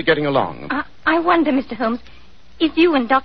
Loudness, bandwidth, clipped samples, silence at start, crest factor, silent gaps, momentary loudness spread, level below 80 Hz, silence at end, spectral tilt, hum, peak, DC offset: -18 LUFS; 5.6 kHz; under 0.1%; 0 s; 16 dB; none; 9 LU; -48 dBFS; 0 s; -8 dB/octave; none; -2 dBFS; 1%